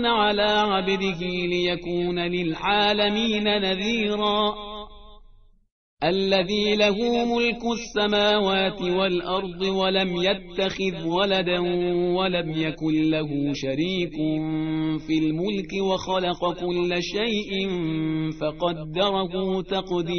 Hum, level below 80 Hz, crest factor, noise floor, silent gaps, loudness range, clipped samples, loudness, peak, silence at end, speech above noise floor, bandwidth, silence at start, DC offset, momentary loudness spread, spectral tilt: none; -48 dBFS; 16 dB; -52 dBFS; 5.72-5.97 s; 3 LU; under 0.1%; -24 LUFS; -6 dBFS; 0 s; 29 dB; 6.6 kHz; 0 s; 0.2%; 6 LU; -3 dB/octave